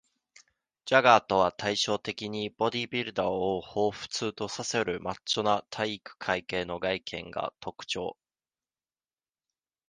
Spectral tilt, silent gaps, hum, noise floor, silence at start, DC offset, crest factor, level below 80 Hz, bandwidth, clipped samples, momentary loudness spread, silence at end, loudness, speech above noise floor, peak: -3.5 dB/octave; none; none; under -90 dBFS; 0.85 s; under 0.1%; 26 dB; -62 dBFS; 10 kHz; under 0.1%; 12 LU; 1.8 s; -29 LUFS; over 61 dB; -4 dBFS